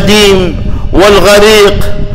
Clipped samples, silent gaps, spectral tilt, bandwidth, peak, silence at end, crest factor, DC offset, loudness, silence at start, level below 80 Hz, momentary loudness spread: 0.4%; none; -4 dB/octave; 16.5 kHz; 0 dBFS; 0 s; 4 dB; under 0.1%; -5 LUFS; 0 s; -14 dBFS; 11 LU